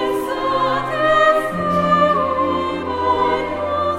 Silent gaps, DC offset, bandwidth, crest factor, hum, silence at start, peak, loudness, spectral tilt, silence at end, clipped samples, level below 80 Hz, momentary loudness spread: none; under 0.1%; 16 kHz; 14 dB; none; 0 s; -4 dBFS; -17 LUFS; -6 dB/octave; 0 s; under 0.1%; -44 dBFS; 7 LU